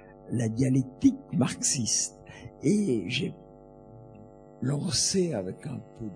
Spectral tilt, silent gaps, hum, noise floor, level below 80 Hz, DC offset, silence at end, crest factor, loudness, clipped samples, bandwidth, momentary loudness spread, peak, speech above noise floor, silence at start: -4.5 dB/octave; none; none; -50 dBFS; -58 dBFS; under 0.1%; 0 s; 18 dB; -27 LUFS; under 0.1%; 10 kHz; 13 LU; -10 dBFS; 22 dB; 0 s